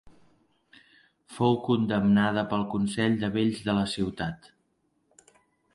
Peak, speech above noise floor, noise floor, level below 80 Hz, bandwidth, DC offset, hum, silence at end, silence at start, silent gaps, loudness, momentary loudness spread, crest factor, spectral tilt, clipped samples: -10 dBFS; 46 dB; -72 dBFS; -56 dBFS; 11.5 kHz; under 0.1%; none; 1.4 s; 0.05 s; none; -27 LUFS; 11 LU; 18 dB; -6.5 dB/octave; under 0.1%